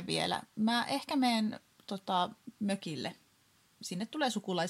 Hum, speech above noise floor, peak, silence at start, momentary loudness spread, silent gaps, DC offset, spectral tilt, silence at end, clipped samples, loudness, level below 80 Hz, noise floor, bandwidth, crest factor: none; 35 dB; -18 dBFS; 0 s; 12 LU; none; under 0.1%; -4.5 dB/octave; 0 s; under 0.1%; -34 LUFS; -80 dBFS; -68 dBFS; 15 kHz; 18 dB